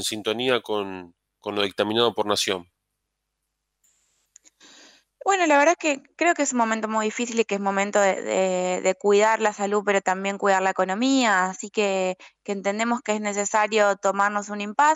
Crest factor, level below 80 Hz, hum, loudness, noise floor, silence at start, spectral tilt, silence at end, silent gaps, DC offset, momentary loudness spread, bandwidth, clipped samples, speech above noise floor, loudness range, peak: 18 dB; -76 dBFS; none; -23 LUFS; -80 dBFS; 0 s; -3 dB/octave; 0 s; none; under 0.1%; 9 LU; 16 kHz; under 0.1%; 57 dB; 5 LU; -6 dBFS